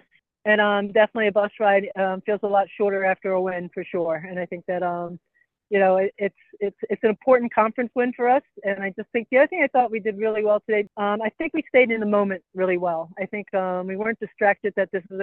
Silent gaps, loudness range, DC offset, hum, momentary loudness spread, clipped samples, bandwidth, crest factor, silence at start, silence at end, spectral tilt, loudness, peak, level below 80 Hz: none; 4 LU; under 0.1%; none; 10 LU; under 0.1%; 4.2 kHz; 18 dB; 0.45 s; 0 s; -9 dB/octave; -23 LUFS; -4 dBFS; -70 dBFS